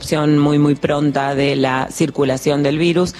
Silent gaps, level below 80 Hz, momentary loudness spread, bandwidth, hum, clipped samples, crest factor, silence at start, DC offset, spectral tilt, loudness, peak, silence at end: none; -46 dBFS; 4 LU; 13 kHz; none; under 0.1%; 14 dB; 0 s; under 0.1%; -6 dB/octave; -16 LUFS; -2 dBFS; 0 s